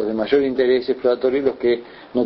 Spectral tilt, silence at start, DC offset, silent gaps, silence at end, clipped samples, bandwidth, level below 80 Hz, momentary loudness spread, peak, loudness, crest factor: -8.5 dB/octave; 0 s; under 0.1%; none; 0 s; under 0.1%; 5.8 kHz; -54 dBFS; 4 LU; -4 dBFS; -19 LUFS; 14 dB